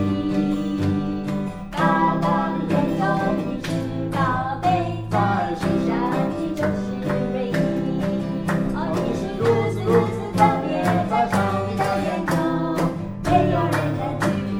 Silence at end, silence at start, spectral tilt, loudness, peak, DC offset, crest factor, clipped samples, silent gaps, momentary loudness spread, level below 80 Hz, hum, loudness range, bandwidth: 0 s; 0 s; -7 dB/octave; -22 LUFS; -4 dBFS; under 0.1%; 18 dB; under 0.1%; none; 6 LU; -42 dBFS; none; 2 LU; over 20 kHz